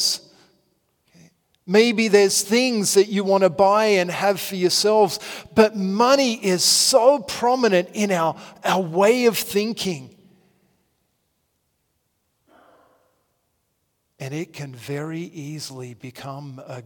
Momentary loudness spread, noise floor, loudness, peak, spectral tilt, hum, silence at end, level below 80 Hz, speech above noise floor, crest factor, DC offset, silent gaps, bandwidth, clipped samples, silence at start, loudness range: 18 LU; -72 dBFS; -19 LUFS; -2 dBFS; -3.5 dB/octave; none; 0.05 s; -66 dBFS; 52 dB; 20 dB; under 0.1%; none; 18 kHz; under 0.1%; 0 s; 17 LU